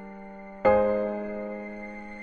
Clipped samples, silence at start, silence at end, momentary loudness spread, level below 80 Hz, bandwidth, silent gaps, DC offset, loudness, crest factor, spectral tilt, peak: under 0.1%; 0 s; 0 s; 20 LU; -52 dBFS; 4.6 kHz; none; under 0.1%; -27 LUFS; 18 dB; -8.5 dB/octave; -10 dBFS